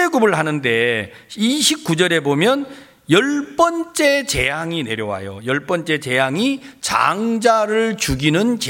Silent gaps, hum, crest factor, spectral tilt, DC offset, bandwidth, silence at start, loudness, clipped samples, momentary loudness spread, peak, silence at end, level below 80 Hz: none; none; 16 dB; -4 dB/octave; under 0.1%; 17 kHz; 0 s; -17 LUFS; under 0.1%; 7 LU; 0 dBFS; 0 s; -44 dBFS